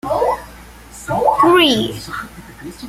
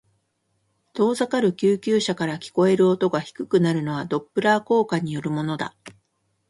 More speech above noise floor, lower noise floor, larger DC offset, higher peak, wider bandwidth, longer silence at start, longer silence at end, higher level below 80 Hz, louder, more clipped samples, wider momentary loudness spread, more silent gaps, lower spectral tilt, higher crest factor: second, 19 dB vs 50 dB; second, -38 dBFS vs -71 dBFS; neither; about the same, -2 dBFS vs -4 dBFS; first, 16 kHz vs 11.5 kHz; second, 0.05 s vs 0.95 s; second, 0 s vs 0.6 s; first, -42 dBFS vs -64 dBFS; first, -15 LUFS vs -22 LUFS; neither; first, 23 LU vs 8 LU; neither; second, -4 dB/octave vs -6 dB/octave; about the same, 16 dB vs 18 dB